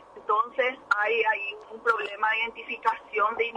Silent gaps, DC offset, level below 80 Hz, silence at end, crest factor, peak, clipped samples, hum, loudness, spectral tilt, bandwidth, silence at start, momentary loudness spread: none; under 0.1%; -70 dBFS; 0 s; 16 dB; -10 dBFS; under 0.1%; none; -26 LUFS; -2 dB/octave; 10 kHz; 0 s; 5 LU